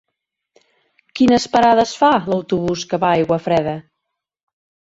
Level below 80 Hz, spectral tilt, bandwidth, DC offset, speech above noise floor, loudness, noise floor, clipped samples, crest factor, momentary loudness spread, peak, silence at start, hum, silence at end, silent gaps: -50 dBFS; -5.5 dB/octave; 8 kHz; under 0.1%; 63 dB; -16 LUFS; -78 dBFS; under 0.1%; 18 dB; 8 LU; -2 dBFS; 1.15 s; none; 1.05 s; none